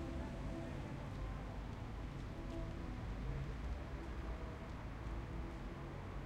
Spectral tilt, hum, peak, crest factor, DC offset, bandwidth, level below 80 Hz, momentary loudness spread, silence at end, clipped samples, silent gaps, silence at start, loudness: -7 dB/octave; none; -30 dBFS; 16 dB; under 0.1%; 11.5 kHz; -48 dBFS; 3 LU; 0 s; under 0.1%; none; 0 s; -48 LUFS